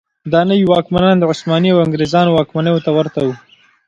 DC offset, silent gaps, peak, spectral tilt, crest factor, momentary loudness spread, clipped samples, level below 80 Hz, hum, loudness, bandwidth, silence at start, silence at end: under 0.1%; none; 0 dBFS; -7 dB/octave; 14 dB; 6 LU; under 0.1%; -46 dBFS; none; -14 LUFS; 7.8 kHz; 0.25 s; 0.5 s